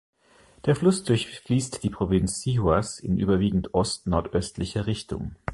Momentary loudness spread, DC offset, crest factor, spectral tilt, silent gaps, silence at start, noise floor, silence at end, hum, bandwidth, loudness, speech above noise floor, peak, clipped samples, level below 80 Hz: 8 LU; under 0.1%; 18 dB; -6 dB/octave; none; 0.65 s; -57 dBFS; 0 s; none; 11.5 kHz; -25 LUFS; 32 dB; -6 dBFS; under 0.1%; -42 dBFS